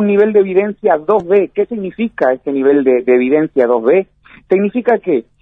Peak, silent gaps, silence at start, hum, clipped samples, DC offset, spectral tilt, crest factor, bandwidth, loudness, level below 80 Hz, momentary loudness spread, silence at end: 0 dBFS; none; 0 s; none; under 0.1%; under 0.1%; -9.5 dB/octave; 12 dB; 3.9 kHz; -13 LUFS; -56 dBFS; 7 LU; 0.2 s